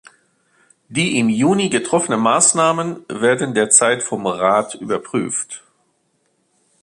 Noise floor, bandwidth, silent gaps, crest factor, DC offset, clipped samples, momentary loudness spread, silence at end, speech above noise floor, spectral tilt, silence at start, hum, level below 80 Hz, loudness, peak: -65 dBFS; 11.5 kHz; none; 18 dB; under 0.1%; under 0.1%; 12 LU; 1.25 s; 48 dB; -3 dB/octave; 0.9 s; none; -62 dBFS; -16 LUFS; 0 dBFS